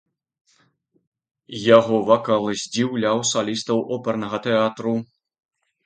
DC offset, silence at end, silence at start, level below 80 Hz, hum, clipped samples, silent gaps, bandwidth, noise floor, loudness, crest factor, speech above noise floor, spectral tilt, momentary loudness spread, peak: under 0.1%; 0.8 s; 1.5 s; -64 dBFS; none; under 0.1%; none; 9.2 kHz; -64 dBFS; -20 LUFS; 22 dB; 44 dB; -4.5 dB/octave; 10 LU; 0 dBFS